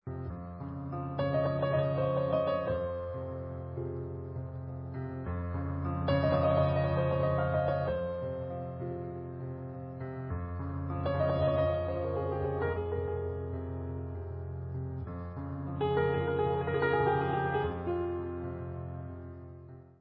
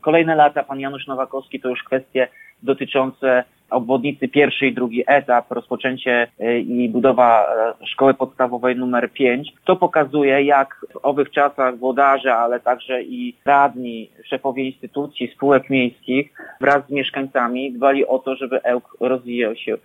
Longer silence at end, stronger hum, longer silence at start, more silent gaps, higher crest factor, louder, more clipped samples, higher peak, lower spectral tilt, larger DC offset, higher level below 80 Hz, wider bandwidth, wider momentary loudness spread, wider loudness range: about the same, 0.1 s vs 0.1 s; neither; about the same, 0.05 s vs 0.05 s; neither; about the same, 16 dB vs 16 dB; second, -33 LUFS vs -19 LUFS; neither; second, -16 dBFS vs -2 dBFS; about the same, -7 dB/octave vs -7 dB/octave; neither; first, -46 dBFS vs -66 dBFS; second, 5.2 kHz vs 7.4 kHz; about the same, 12 LU vs 10 LU; first, 6 LU vs 3 LU